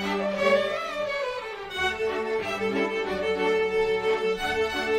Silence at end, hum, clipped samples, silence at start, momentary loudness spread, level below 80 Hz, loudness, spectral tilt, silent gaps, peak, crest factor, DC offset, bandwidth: 0 s; none; under 0.1%; 0 s; 6 LU; -52 dBFS; -26 LUFS; -4 dB/octave; none; -10 dBFS; 16 dB; under 0.1%; 15.5 kHz